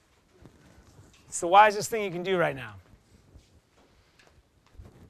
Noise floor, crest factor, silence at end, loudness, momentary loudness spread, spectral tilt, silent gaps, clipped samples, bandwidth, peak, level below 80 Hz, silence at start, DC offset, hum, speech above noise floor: -62 dBFS; 24 dB; 0.25 s; -24 LUFS; 19 LU; -3.5 dB/octave; none; under 0.1%; 13.5 kHz; -6 dBFS; -62 dBFS; 1.3 s; under 0.1%; none; 38 dB